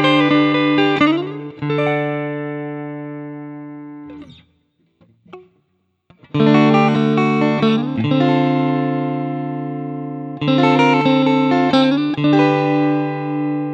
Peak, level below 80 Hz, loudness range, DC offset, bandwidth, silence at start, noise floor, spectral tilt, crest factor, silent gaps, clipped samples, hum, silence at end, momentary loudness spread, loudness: 0 dBFS; -62 dBFS; 16 LU; under 0.1%; 7.8 kHz; 0 s; -66 dBFS; -7.5 dB/octave; 16 dB; none; under 0.1%; none; 0 s; 16 LU; -16 LUFS